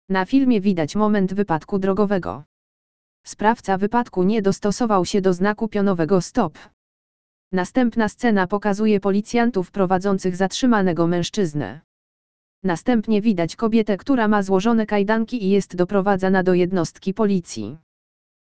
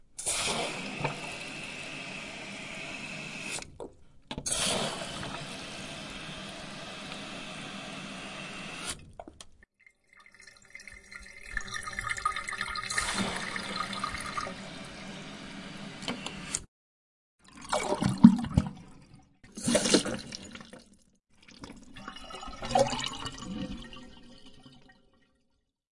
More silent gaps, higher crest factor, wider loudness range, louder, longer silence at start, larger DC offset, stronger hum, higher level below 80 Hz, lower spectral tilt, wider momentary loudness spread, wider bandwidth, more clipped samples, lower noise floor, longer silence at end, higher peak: first, 2.46-3.24 s, 6.73-7.51 s, 11.84-12.62 s vs 16.68-17.39 s; second, 18 dB vs 32 dB; second, 3 LU vs 13 LU; first, -20 LUFS vs -32 LUFS; about the same, 0.1 s vs 0.1 s; first, 2% vs under 0.1%; neither; about the same, -50 dBFS vs -54 dBFS; first, -6.5 dB/octave vs -4 dB/octave; second, 6 LU vs 21 LU; second, 8 kHz vs 11.5 kHz; neither; first, under -90 dBFS vs -75 dBFS; second, 0.65 s vs 1.1 s; about the same, -2 dBFS vs -2 dBFS